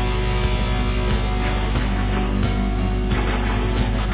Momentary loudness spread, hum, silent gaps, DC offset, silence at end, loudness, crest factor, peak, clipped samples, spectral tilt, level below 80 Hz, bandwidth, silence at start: 1 LU; 50 Hz at -20 dBFS; none; under 0.1%; 0 s; -22 LUFS; 12 dB; -8 dBFS; under 0.1%; -10.5 dB/octave; -22 dBFS; 4 kHz; 0 s